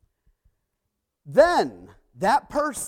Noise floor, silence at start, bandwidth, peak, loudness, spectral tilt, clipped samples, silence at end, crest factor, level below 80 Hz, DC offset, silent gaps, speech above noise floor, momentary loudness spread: -80 dBFS; 1.25 s; 16 kHz; -4 dBFS; -22 LUFS; -4 dB/octave; under 0.1%; 0 s; 20 dB; -54 dBFS; under 0.1%; none; 59 dB; 9 LU